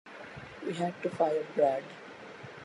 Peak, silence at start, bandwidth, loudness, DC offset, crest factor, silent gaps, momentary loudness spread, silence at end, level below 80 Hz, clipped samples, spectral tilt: -14 dBFS; 0.05 s; 11.5 kHz; -32 LUFS; under 0.1%; 18 dB; none; 18 LU; 0 s; -70 dBFS; under 0.1%; -6.5 dB/octave